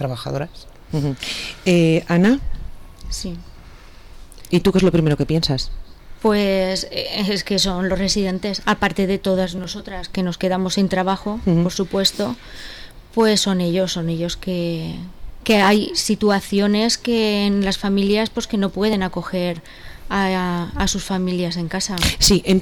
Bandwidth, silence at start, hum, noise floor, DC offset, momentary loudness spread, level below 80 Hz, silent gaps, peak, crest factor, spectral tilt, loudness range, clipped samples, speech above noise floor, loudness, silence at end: 19 kHz; 0 s; none; -40 dBFS; under 0.1%; 13 LU; -36 dBFS; none; -6 dBFS; 14 dB; -4.5 dB/octave; 3 LU; under 0.1%; 21 dB; -19 LUFS; 0 s